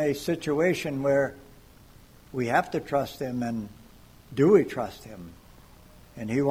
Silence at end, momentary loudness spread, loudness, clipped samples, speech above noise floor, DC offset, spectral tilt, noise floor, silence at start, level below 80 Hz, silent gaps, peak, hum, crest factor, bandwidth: 0 s; 20 LU; -26 LUFS; under 0.1%; 26 dB; under 0.1%; -6.5 dB/octave; -52 dBFS; 0 s; -56 dBFS; none; -8 dBFS; none; 20 dB; 16 kHz